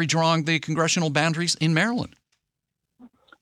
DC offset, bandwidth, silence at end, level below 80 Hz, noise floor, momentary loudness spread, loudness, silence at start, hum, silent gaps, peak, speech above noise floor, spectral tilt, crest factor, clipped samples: under 0.1%; 12 kHz; 0.35 s; -64 dBFS; -82 dBFS; 4 LU; -22 LUFS; 0 s; none; none; -6 dBFS; 59 dB; -4 dB/octave; 18 dB; under 0.1%